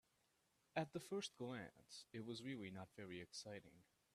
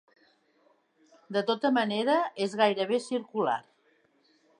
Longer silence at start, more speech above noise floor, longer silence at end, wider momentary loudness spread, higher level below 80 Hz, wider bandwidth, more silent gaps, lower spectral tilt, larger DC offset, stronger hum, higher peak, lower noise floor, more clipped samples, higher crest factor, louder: second, 0.75 s vs 1.3 s; second, 31 dB vs 40 dB; second, 0.35 s vs 1 s; first, 9 LU vs 6 LU; about the same, -86 dBFS vs -84 dBFS; first, 13.5 kHz vs 11 kHz; neither; about the same, -4.5 dB/octave vs -5 dB/octave; neither; neither; second, -30 dBFS vs -10 dBFS; first, -83 dBFS vs -68 dBFS; neither; about the same, 24 dB vs 20 dB; second, -52 LUFS vs -28 LUFS